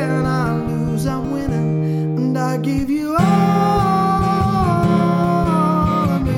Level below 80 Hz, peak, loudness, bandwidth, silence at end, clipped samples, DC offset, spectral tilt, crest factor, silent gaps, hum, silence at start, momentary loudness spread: -34 dBFS; -4 dBFS; -17 LUFS; 15 kHz; 0 s; under 0.1%; under 0.1%; -8 dB/octave; 12 dB; none; none; 0 s; 5 LU